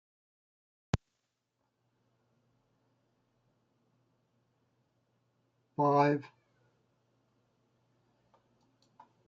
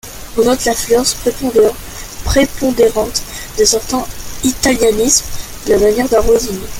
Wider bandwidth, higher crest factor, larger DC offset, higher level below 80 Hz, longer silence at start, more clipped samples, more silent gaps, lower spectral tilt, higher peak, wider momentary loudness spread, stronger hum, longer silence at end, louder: second, 7.4 kHz vs 17 kHz; first, 26 dB vs 14 dB; neither; second, -62 dBFS vs -28 dBFS; first, 0.95 s vs 0.05 s; neither; neither; first, -6.5 dB/octave vs -3 dB/octave; second, -14 dBFS vs 0 dBFS; about the same, 11 LU vs 12 LU; neither; first, 3 s vs 0 s; second, -31 LUFS vs -13 LUFS